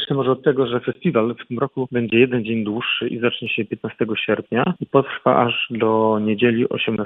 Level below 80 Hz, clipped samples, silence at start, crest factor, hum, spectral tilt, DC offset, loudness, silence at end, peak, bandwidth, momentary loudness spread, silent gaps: -62 dBFS; under 0.1%; 0 s; 18 dB; none; -9.5 dB/octave; under 0.1%; -20 LUFS; 0 s; 0 dBFS; 4 kHz; 6 LU; none